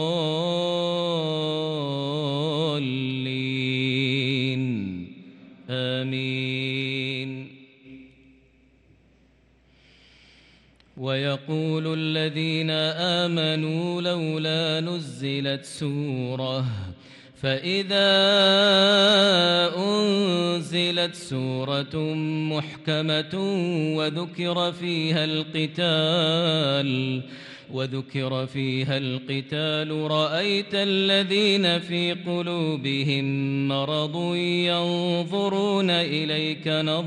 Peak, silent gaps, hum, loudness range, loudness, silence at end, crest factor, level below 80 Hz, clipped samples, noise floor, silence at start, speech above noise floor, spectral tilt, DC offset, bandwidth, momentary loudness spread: -8 dBFS; none; none; 10 LU; -24 LUFS; 0 s; 16 dB; -66 dBFS; under 0.1%; -59 dBFS; 0 s; 36 dB; -5.5 dB/octave; under 0.1%; 11.5 kHz; 9 LU